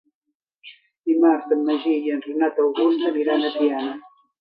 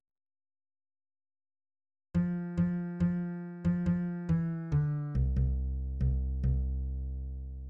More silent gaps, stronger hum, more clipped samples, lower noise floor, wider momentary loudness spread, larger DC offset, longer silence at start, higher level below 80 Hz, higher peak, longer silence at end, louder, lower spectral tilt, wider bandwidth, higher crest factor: first, 0.98-1.03 s vs none; neither; neither; second, -80 dBFS vs under -90 dBFS; first, 10 LU vs 7 LU; neither; second, 0.65 s vs 2.15 s; second, -80 dBFS vs -38 dBFS; first, -6 dBFS vs -20 dBFS; first, 0.4 s vs 0 s; first, -21 LUFS vs -33 LUFS; second, -7 dB/octave vs -10.5 dB/octave; first, 5 kHz vs 3.2 kHz; about the same, 16 dB vs 14 dB